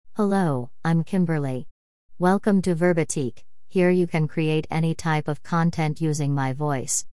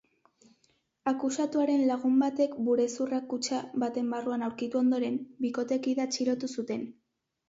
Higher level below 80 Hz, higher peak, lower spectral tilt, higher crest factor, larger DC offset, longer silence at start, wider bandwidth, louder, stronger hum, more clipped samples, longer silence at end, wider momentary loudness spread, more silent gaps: first, -58 dBFS vs -76 dBFS; first, -8 dBFS vs -16 dBFS; first, -6 dB/octave vs -4 dB/octave; about the same, 16 dB vs 14 dB; first, 2% vs under 0.1%; second, 0.05 s vs 1.05 s; first, 12 kHz vs 8 kHz; first, -23 LUFS vs -30 LUFS; neither; neither; second, 0 s vs 0.55 s; about the same, 6 LU vs 7 LU; first, 1.71-2.09 s vs none